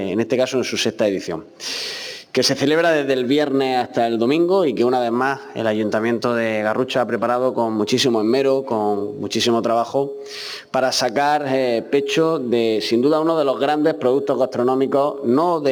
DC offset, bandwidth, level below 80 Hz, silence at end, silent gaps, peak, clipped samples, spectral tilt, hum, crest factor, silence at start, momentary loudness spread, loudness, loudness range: under 0.1%; 19 kHz; -66 dBFS; 0 s; none; -6 dBFS; under 0.1%; -4.5 dB/octave; none; 14 dB; 0 s; 7 LU; -19 LUFS; 2 LU